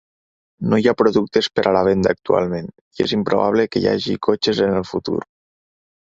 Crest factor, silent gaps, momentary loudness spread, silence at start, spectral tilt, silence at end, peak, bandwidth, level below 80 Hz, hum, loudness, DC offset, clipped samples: 18 dB; 2.81-2.91 s; 9 LU; 0.6 s; -6 dB/octave; 0.95 s; -2 dBFS; 7.8 kHz; -50 dBFS; none; -19 LUFS; under 0.1%; under 0.1%